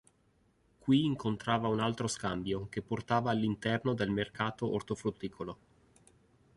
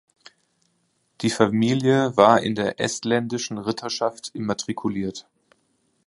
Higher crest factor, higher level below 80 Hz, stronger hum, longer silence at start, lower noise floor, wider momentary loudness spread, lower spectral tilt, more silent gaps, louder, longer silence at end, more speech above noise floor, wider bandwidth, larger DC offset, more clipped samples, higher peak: about the same, 20 dB vs 22 dB; about the same, -60 dBFS vs -60 dBFS; neither; second, 0.85 s vs 1.2 s; about the same, -70 dBFS vs -69 dBFS; about the same, 12 LU vs 11 LU; about the same, -5.5 dB/octave vs -5 dB/octave; neither; second, -33 LUFS vs -22 LUFS; first, 1 s vs 0.85 s; second, 38 dB vs 47 dB; about the same, 11.5 kHz vs 11.5 kHz; neither; neither; second, -16 dBFS vs 0 dBFS